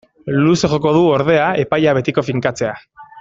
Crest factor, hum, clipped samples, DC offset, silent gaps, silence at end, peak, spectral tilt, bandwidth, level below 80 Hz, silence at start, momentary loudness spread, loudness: 14 dB; none; under 0.1%; under 0.1%; none; 0 s; -2 dBFS; -6 dB/octave; 7.8 kHz; -48 dBFS; 0.25 s; 8 LU; -15 LUFS